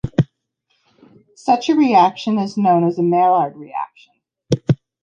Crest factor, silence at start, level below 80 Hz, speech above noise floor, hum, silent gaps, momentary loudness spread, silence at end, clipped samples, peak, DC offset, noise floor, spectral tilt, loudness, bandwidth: 16 dB; 0.05 s; -50 dBFS; 52 dB; none; none; 14 LU; 0.25 s; under 0.1%; -2 dBFS; under 0.1%; -68 dBFS; -7.5 dB/octave; -17 LUFS; 9 kHz